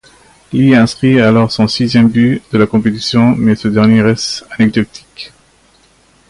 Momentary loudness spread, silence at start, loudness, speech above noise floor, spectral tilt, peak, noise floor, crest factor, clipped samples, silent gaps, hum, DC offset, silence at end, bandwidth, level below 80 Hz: 11 LU; 0.5 s; -11 LUFS; 39 dB; -6.5 dB/octave; 0 dBFS; -49 dBFS; 12 dB; under 0.1%; none; none; under 0.1%; 1.05 s; 11.5 kHz; -42 dBFS